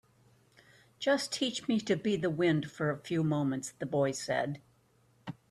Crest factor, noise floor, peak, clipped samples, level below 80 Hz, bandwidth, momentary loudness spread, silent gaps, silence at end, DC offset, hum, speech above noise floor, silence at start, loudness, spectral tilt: 16 dB; -68 dBFS; -16 dBFS; under 0.1%; -70 dBFS; 13 kHz; 9 LU; none; 0.2 s; under 0.1%; none; 36 dB; 1 s; -32 LUFS; -5 dB/octave